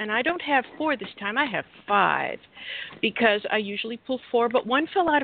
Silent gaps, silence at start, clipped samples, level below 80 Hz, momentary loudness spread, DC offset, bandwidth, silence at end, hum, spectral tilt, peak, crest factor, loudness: none; 0 s; under 0.1%; -66 dBFS; 11 LU; under 0.1%; 4.7 kHz; 0 s; none; -8.5 dB/octave; -4 dBFS; 20 dB; -25 LUFS